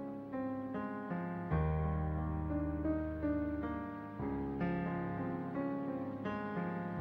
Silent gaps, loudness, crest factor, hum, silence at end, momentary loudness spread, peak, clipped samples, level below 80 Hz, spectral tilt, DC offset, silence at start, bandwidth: none; -39 LUFS; 14 dB; none; 0 s; 5 LU; -24 dBFS; under 0.1%; -48 dBFS; -10.5 dB/octave; under 0.1%; 0 s; 5.2 kHz